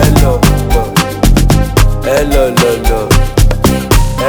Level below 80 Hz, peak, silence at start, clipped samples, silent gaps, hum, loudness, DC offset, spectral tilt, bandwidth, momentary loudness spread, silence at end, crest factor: -12 dBFS; 0 dBFS; 0 s; 0.4%; none; none; -11 LUFS; under 0.1%; -5.5 dB/octave; over 20 kHz; 3 LU; 0 s; 8 dB